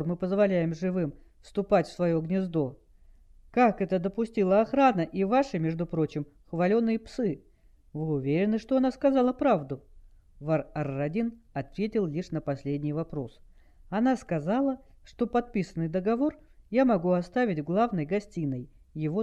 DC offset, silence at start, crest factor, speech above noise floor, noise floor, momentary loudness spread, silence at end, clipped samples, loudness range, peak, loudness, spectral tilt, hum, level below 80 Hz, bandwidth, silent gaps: under 0.1%; 0 s; 18 dB; 28 dB; -55 dBFS; 11 LU; 0 s; under 0.1%; 5 LU; -10 dBFS; -28 LUFS; -8.5 dB/octave; none; -54 dBFS; 9.6 kHz; none